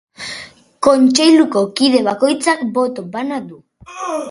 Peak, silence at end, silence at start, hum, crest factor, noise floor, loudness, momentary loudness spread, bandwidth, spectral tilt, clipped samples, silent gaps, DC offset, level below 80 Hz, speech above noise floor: 0 dBFS; 0 s; 0.2 s; none; 16 dB; -36 dBFS; -14 LUFS; 17 LU; 11.5 kHz; -3.5 dB/octave; under 0.1%; none; under 0.1%; -58 dBFS; 21 dB